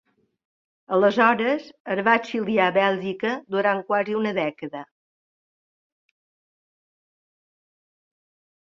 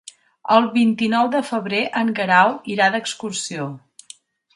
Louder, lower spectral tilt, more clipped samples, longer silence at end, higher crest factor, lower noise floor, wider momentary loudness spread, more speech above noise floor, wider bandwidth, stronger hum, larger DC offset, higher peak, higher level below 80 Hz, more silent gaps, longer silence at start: second, -22 LUFS vs -19 LUFS; first, -6 dB/octave vs -4 dB/octave; neither; first, 3.8 s vs 0.75 s; about the same, 22 dB vs 20 dB; first, under -90 dBFS vs -47 dBFS; second, 10 LU vs 13 LU; first, over 68 dB vs 28 dB; second, 7.4 kHz vs 11.5 kHz; neither; neither; second, -4 dBFS vs 0 dBFS; about the same, -72 dBFS vs -70 dBFS; first, 1.80-1.85 s vs none; first, 0.9 s vs 0.45 s